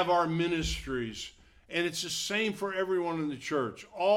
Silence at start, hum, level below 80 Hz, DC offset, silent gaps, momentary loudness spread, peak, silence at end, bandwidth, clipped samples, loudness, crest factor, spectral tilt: 0 s; none; -50 dBFS; under 0.1%; none; 8 LU; -14 dBFS; 0 s; 17 kHz; under 0.1%; -31 LUFS; 16 dB; -4 dB/octave